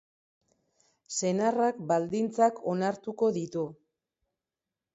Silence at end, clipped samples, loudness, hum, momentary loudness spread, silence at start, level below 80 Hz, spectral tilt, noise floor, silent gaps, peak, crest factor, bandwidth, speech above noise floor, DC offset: 1.2 s; under 0.1%; -29 LUFS; none; 9 LU; 1.1 s; -76 dBFS; -5.5 dB/octave; -90 dBFS; none; -12 dBFS; 20 dB; 8 kHz; 62 dB; under 0.1%